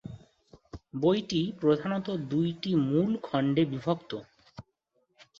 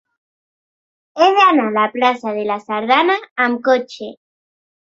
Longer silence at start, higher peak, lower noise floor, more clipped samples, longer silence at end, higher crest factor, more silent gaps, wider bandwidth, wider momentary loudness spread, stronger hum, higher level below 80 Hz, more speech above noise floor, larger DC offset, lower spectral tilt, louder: second, 0.05 s vs 1.15 s; second, -12 dBFS vs -2 dBFS; second, -75 dBFS vs under -90 dBFS; neither; second, 0.15 s vs 0.8 s; about the same, 18 dB vs 16 dB; second, none vs 3.31-3.36 s; about the same, 7.4 kHz vs 7.8 kHz; about the same, 15 LU vs 17 LU; neither; first, -62 dBFS vs -70 dBFS; second, 47 dB vs over 74 dB; neither; first, -7.5 dB/octave vs -4.5 dB/octave; second, -29 LUFS vs -15 LUFS